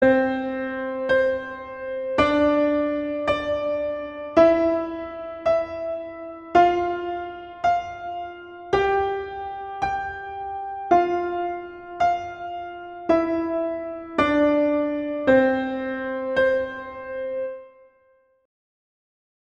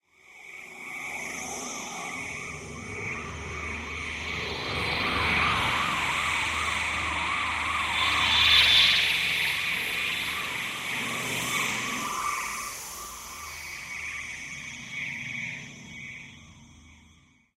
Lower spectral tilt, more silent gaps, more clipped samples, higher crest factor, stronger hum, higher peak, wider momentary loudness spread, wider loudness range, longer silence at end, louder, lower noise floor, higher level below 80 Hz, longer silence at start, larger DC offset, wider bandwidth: first, -6.5 dB/octave vs -1.5 dB/octave; neither; neither; about the same, 20 dB vs 22 dB; neither; first, -4 dBFS vs -8 dBFS; about the same, 14 LU vs 16 LU; second, 4 LU vs 14 LU; first, 1.75 s vs 0.55 s; first, -23 LUFS vs -26 LUFS; about the same, -61 dBFS vs -59 dBFS; about the same, -52 dBFS vs -50 dBFS; second, 0 s vs 0.3 s; neither; second, 8.4 kHz vs 16 kHz